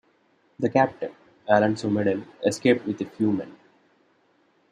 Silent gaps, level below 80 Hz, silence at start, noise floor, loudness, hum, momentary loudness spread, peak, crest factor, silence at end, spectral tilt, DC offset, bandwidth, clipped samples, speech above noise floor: none; -68 dBFS; 0.6 s; -64 dBFS; -24 LUFS; none; 14 LU; -4 dBFS; 22 dB; 1.2 s; -6 dB/octave; under 0.1%; 12.5 kHz; under 0.1%; 41 dB